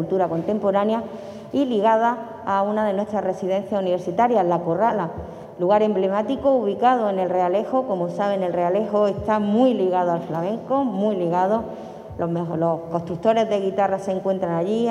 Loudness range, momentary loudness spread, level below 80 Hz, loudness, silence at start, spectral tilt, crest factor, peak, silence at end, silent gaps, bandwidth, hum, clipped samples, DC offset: 2 LU; 8 LU; -56 dBFS; -22 LUFS; 0 s; -7.5 dB/octave; 16 dB; -6 dBFS; 0 s; none; 11.5 kHz; none; under 0.1%; under 0.1%